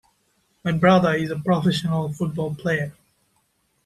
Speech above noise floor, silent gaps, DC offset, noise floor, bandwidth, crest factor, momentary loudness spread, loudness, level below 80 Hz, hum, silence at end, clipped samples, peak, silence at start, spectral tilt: 47 dB; none; under 0.1%; -68 dBFS; 13 kHz; 20 dB; 10 LU; -22 LUFS; -56 dBFS; none; 0.95 s; under 0.1%; -4 dBFS; 0.65 s; -7 dB/octave